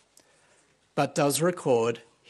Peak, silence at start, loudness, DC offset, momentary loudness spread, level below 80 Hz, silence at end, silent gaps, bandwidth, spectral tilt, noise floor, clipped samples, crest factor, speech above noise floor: -10 dBFS; 0.95 s; -26 LUFS; under 0.1%; 6 LU; -78 dBFS; 0.3 s; none; 12.5 kHz; -4.5 dB/octave; -64 dBFS; under 0.1%; 18 dB; 39 dB